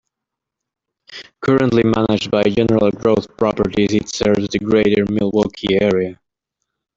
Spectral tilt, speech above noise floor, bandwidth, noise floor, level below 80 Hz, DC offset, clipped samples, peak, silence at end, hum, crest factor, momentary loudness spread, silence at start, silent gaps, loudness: -6 dB/octave; 67 dB; 7.8 kHz; -82 dBFS; -46 dBFS; under 0.1%; under 0.1%; -2 dBFS; 0.85 s; none; 16 dB; 6 LU; 1.1 s; none; -16 LUFS